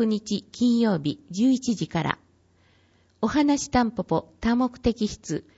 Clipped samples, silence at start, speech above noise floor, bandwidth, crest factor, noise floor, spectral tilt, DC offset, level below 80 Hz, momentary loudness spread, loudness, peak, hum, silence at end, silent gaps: under 0.1%; 0 s; 37 dB; 8 kHz; 20 dB; -61 dBFS; -5.5 dB/octave; under 0.1%; -48 dBFS; 8 LU; -25 LUFS; -6 dBFS; none; 0.15 s; none